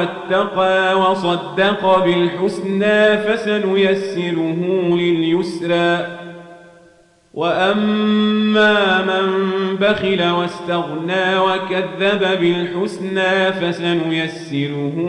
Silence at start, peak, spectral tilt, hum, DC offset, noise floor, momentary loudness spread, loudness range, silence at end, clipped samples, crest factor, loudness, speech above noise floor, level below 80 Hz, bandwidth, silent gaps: 0 s; -4 dBFS; -6 dB/octave; none; under 0.1%; -51 dBFS; 7 LU; 3 LU; 0 s; under 0.1%; 12 dB; -17 LUFS; 34 dB; -60 dBFS; 11 kHz; none